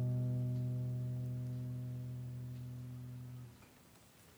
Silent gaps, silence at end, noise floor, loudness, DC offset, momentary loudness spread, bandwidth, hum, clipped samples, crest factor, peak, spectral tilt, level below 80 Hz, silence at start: none; 0 s; -63 dBFS; -42 LUFS; under 0.1%; 23 LU; over 20 kHz; none; under 0.1%; 12 dB; -30 dBFS; -8.5 dB/octave; -66 dBFS; 0 s